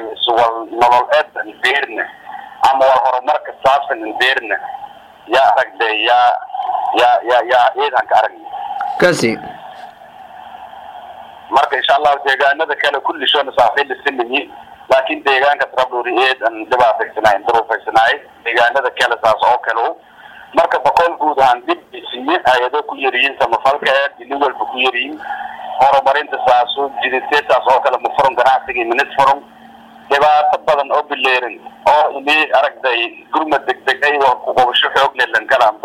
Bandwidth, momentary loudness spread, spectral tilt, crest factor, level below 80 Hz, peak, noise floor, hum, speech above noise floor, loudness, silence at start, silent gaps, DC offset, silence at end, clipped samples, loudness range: 15 kHz; 10 LU; -3 dB/octave; 12 dB; -54 dBFS; -2 dBFS; -40 dBFS; none; 26 dB; -14 LUFS; 0 s; none; under 0.1%; 0.05 s; under 0.1%; 2 LU